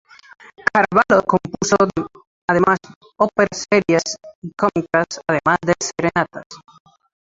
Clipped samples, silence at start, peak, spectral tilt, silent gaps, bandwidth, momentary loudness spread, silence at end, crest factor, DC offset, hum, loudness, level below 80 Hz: under 0.1%; 0.65 s; 0 dBFS; -4.5 dB/octave; 2.27-2.48 s, 2.96-3.01 s, 4.35-4.42 s, 6.46-6.50 s; 7.8 kHz; 12 LU; 0.8 s; 20 dB; under 0.1%; none; -18 LUFS; -52 dBFS